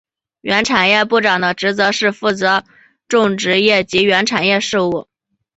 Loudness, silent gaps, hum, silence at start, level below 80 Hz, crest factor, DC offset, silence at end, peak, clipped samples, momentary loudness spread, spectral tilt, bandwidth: -14 LUFS; none; none; 0.45 s; -54 dBFS; 14 dB; under 0.1%; 0.55 s; 0 dBFS; under 0.1%; 6 LU; -3.5 dB/octave; 8.2 kHz